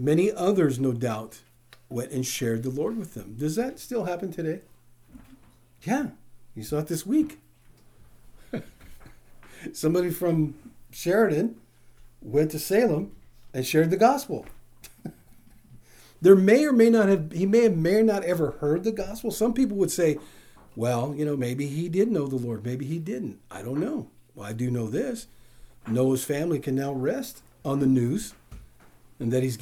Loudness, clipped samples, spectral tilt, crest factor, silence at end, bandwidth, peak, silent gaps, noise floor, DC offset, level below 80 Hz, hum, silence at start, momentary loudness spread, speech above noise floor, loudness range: -25 LUFS; under 0.1%; -6.5 dB/octave; 24 dB; 0 s; over 20 kHz; -2 dBFS; none; -54 dBFS; under 0.1%; -54 dBFS; none; 0 s; 17 LU; 30 dB; 11 LU